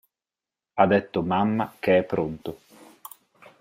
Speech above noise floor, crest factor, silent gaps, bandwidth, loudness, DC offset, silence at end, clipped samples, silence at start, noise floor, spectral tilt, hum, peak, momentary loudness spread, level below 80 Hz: over 67 dB; 22 dB; none; 16 kHz; -24 LUFS; under 0.1%; 1.05 s; under 0.1%; 0.75 s; under -90 dBFS; -7.5 dB/octave; none; -4 dBFS; 23 LU; -60 dBFS